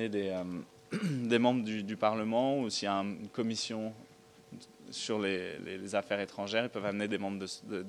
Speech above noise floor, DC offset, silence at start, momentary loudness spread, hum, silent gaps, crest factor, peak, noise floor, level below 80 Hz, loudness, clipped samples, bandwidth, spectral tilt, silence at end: 20 dB; under 0.1%; 0 s; 12 LU; none; none; 20 dB; -14 dBFS; -54 dBFS; -78 dBFS; -34 LUFS; under 0.1%; 12.5 kHz; -5 dB/octave; 0 s